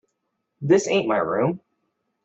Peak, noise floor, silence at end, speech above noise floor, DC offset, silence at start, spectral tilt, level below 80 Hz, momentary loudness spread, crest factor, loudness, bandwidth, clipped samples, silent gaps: -6 dBFS; -76 dBFS; 0.7 s; 56 dB; under 0.1%; 0.6 s; -5.5 dB/octave; -66 dBFS; 13 LU; 18 dB; -21 LUFS; 8.2 kHz; under 0.1%; none